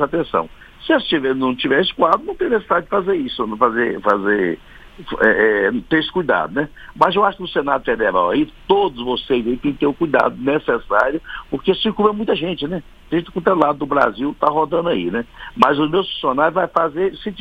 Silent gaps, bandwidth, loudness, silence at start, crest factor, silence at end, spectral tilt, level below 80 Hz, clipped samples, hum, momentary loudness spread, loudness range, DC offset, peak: none; 8.4 kHz; -18 LUFS; 0 s; 18 dB; 0 s; -7 dB/octave; -44 dBFS; under 0.1%; none; 8 LU; 1 LU; under 0.1%; 0 dBFS